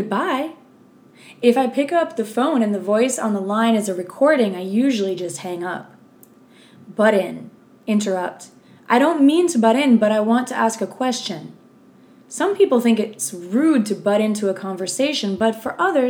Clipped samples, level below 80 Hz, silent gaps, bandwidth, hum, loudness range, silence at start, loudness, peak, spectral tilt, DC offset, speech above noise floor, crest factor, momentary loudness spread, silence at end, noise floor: under 0.1%; -72 dBFS; none; 17 kHz; none; 5 LU; 0 s; -19 LUFS; 0 dBFS; -4.5 dB/octave; under 0.1%; 31 dB; 18 dB; 12 LU; 0 s; -50 dBFS